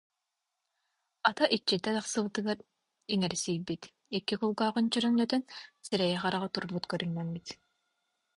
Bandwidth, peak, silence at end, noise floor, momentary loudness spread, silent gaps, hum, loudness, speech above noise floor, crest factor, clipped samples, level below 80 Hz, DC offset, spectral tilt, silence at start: 11.5 kHz; -10 dBFS; 0.8 s; -85 dBFS; 13 LU; none; none; -32 LUFS; 54 dB; 24 dB; under 0.1%; -70 dBFS; under 0.1%; -4.5 dB/octave; 1.25 s